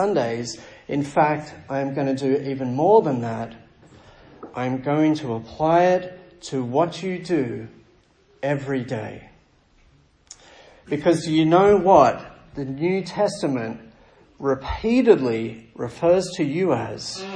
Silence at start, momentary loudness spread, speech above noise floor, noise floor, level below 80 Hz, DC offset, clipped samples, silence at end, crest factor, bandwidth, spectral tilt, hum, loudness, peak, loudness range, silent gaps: 0 s; 16 LU; 36 dB; -57 dBFS; -50 dBFS; under 0.1%; under 0.1%; 0 s; 20 dB; 10 kHz; -6.5 dB/octave; none; -21 LUFS; -2 dBFS; 8 LU; none